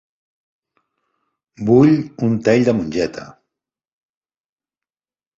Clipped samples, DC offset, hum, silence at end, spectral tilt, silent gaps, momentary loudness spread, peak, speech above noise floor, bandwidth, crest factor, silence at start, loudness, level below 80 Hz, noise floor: under 0.1%; under 0.1%; none; 2.1 s; -7.5 dB/octave; none; 13 LU; -2 dBFS; over 75 dB; 7.8 kHz; 18 dB; 1.6 s; -16 LUFS; -54 dBFS; under -90 dBFS